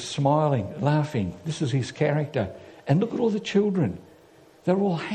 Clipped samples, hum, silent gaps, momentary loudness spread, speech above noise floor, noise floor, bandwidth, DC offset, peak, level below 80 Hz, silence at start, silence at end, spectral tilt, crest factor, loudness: under 0.1%; none; none; 8 LU; 29 dB; -53 dBFS; 9.6 kHz; under 0.1%; -8 dBFS; -60 dBFS; 0 s; 0 s; -7 dB/octave; 18 dB; -25 LUFS